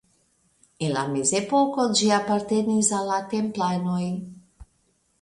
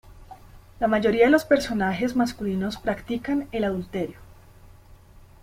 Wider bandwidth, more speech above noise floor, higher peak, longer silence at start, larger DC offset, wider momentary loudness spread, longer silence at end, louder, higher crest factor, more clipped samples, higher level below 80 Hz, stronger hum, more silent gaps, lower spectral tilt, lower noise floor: second, 11.5 kHz vs 16.5 kHz; first, 44 dB vs 26 dB; about the same, -6 dBFS vs -6 dBFS; first, 0.8 s vs 0.05 s; neither; second, 8 LU vs 11 LU; second, 0.6 s vs 1.1 s; about the same, -23 LUFS vs -24 LUFS; about the same, 20 dB vs 20 dB; neither; second, -60 dBFS vs -48 dBFS; neither; neither; second, -4 dB/octave vs -6 dB/octave; first, -67 dBFS vs -49 dBFS